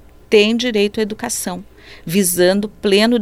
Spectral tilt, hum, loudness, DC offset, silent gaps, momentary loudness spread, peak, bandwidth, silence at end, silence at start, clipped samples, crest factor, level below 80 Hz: -3.5 dB/octave; none; -16 LUFS; under 0.1%; none; 10 LU; 0 dBFS; 16.5 kHz; 0 s; 0.3 s; under 0.1%; 16 dB; -48 dBFS